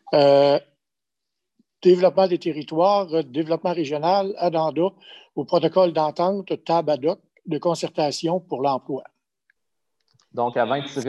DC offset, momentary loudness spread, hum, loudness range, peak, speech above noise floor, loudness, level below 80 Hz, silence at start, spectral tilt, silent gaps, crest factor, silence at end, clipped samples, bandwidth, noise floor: under 0.1%; 10 LU; none; 6 LU; -4 dBFS; 65 dB; -21 LUFS; -72 dBFS; 0.05 s; -6 dB/octave; none; 18 dB; 0 s; under 0.1%; 11 kHz; -86 dBFS